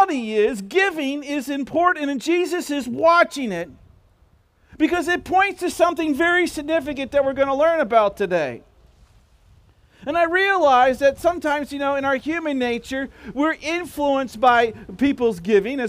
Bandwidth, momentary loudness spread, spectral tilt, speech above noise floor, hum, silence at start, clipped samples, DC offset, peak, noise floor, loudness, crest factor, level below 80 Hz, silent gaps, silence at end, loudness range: 16 kHz; 9 LU; -4.5 dB/octave; 37 dB; none; 0 s; under 0.1%; under 0.1%; -4 dBFS; -57 dBFS; -20 LUFS; 18 dB; -52 dBFS; none; 0 s; 3 LU